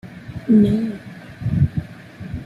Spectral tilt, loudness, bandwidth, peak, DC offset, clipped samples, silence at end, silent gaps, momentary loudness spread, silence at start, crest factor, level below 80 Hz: -9.5 dB/octave; -19 LUFS; 5.4 kHz; -4 dBFS; under 0.1%; under 0.1%; 0 s; none; 22 LU; 0.05 s; 16 dB; -40 dBFS